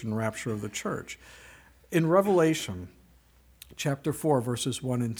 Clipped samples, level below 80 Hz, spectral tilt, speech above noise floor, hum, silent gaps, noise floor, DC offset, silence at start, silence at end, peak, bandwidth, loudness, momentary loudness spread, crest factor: under 0.1%; -60 dBFS; -5.5 dB/octave; 31 dB; none; none; -59 dBFS; under 0.1%; 0 s; 0 s; -10 dBFS; over 20 kHz; -28 LUFS; 20 LU; 20 dB